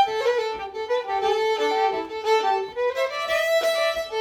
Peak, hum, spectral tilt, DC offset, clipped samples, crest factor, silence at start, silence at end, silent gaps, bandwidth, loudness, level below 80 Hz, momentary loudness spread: -10 dBFS; none; -1.5 dB/octave; under 0.1%; under 0.1%; 14 dB; 0 s; 0 s; none; 19.5 kHz; -23 LUFS; -60 dBFS; 6 LU